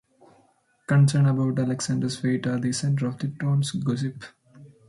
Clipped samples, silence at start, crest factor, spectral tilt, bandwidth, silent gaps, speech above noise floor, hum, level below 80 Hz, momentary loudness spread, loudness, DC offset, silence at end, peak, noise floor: under 0.1%; 0.9 s; 16 dB; -6 dB/octave; 11.5 kHz; none; 40 dB; none; -64 dBFS; 11 LU; -24 LUFS; under 0.1%; 0.2 s; -10 dBFS; -63 dBFS